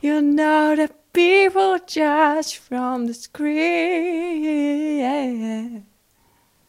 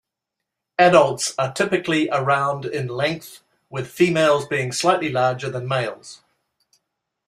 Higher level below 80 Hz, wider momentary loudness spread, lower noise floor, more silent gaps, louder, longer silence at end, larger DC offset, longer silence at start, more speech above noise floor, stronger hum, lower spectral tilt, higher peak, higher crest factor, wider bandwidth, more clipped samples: about the same, -66 dBFS vs -62 dBFS; second, 11 LU vs 14 LU; second, -60 dBFS vs -83 dBFS; neither; about the same, -20 LUFS vs -20 LUFS; second, 0.85 s vs 1.1 s; neither; second, 0.05 s vs 0.8 s; second, 41 dB vs 63 dB; neither; about the same, -3.5 dB/octave vs -4.5 dB/octave; second, -6 dBFS vs -2 dBFS; second, 14 dB vs 20 dB; about the same, 15 kHz vs 15.5 kHz; neither